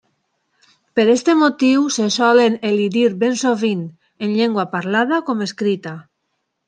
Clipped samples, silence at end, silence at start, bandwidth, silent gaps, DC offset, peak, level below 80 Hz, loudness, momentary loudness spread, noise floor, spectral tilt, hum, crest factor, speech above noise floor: under 0.1%; 0.65 s; 0.95 s; 9.8 kHz; none; under 0.1%; -2 dBFS; -68 dBFS; -17 LUFS; 11 LU; -72 dBFS; -4.5 dB/octave; none; 16 dB; 56 dB